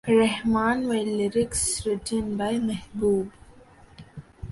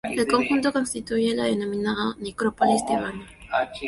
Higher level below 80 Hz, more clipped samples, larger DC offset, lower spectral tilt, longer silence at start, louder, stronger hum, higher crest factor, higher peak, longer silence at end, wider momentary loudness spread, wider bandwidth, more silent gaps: about the same, -48 dBFS vs -52 dBFS; neither; neither; about the same, -4.5 dB/octave vs -4.5 dB/octave; about the same, 0.05 s vs 0.05 s; about the same, -25 LUFS vs -24 LUFS; neither; about the same, 16 dB vs 18 dB; second, -10 dBFS vs -6 dBFS; about the same, 0 s vs 0 s; first, 17 LU vs 7 LU; about the same, 11.5 kHz vs 12 kHz; neither